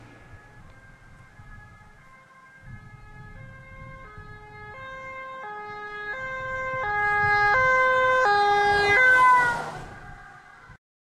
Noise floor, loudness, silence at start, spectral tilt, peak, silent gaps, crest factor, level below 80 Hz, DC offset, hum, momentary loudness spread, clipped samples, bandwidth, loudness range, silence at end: -51 dBFS; -21 LUFS; 0.35 s; -3.5 dB/octave; -8 dBFS; none; 16 dB; -50 dBFS; under 0.1%; none; 27 LU; under 0.1%; 13 kHz; 22 LU; 0.4 s